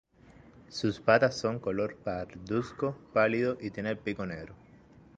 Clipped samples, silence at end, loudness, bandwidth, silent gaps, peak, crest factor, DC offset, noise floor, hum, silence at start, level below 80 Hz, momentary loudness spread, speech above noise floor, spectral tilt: under 0.1%; 0.6 s; -31 LUFS; 9.2 kHz; none; -8 dBFS; 24 dB; under 0.1%; -56 dBFS; none; 0.55 s; -60 dBFS; 14 LU; 26 dB; -6 dB/octave